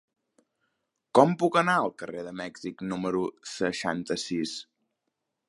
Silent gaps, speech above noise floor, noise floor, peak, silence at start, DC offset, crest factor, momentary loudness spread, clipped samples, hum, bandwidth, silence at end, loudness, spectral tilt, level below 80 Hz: none; 55 dB; -82 dBFS; -4 dBFS; 1.15 s; under 0.1%; 24 dB; 15 LU; under 0.1%; none; 11.5 kHz; 0.85 s; -28 LUFS; -5 dB/octave; -68 dBFS